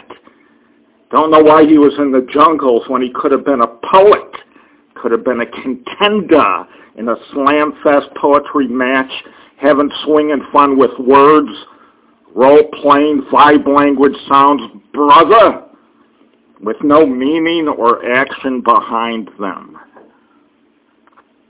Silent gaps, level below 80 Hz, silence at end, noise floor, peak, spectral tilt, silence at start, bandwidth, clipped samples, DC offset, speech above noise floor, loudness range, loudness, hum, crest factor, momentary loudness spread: none; -52 dBFS; 1.85 s; -54 dBFS; 0 dBFS; -9 dB/octave; 0.1 s; 4 kHz; 1%; under 0.1%; 44 dB; 5 LU; -11 LUFS; none; 12 dB; 14 LU